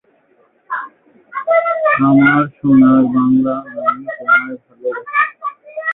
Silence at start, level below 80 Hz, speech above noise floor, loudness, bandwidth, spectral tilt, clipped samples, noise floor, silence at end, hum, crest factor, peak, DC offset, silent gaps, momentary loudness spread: 0.7 s; -56 dBFS; 43 dB; -14 LUFS; 3.9 kHz; -11.5 dB/octave; under 0.1%; -55 dBFS; 0 s; none; 14 dB; 0 dBFS; under 0.1%; none; 15 LU